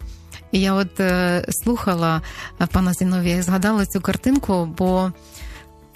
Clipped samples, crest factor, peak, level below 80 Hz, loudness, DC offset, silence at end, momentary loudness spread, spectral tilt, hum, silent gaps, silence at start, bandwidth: under 0.1%; 18 dB; -2 dBFS; -38 dBFS; -20 LUFS; under 0.1%; 0.3 s; 17 LU; -5.5 dB/octave; none; none; 0 s; 14 kHz